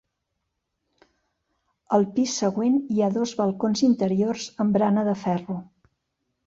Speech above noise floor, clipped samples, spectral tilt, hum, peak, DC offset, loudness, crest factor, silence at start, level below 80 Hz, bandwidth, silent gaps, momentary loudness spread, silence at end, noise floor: 56 dB; under 0.1%; -6 dB/octave; none; -6 dBFS; under 0.1%; -23 LUFS; 18 dB; 1.9 s; -66 dBFS; 7.8 kHz; none; 6 LU; 0.85 s; -79 dBFS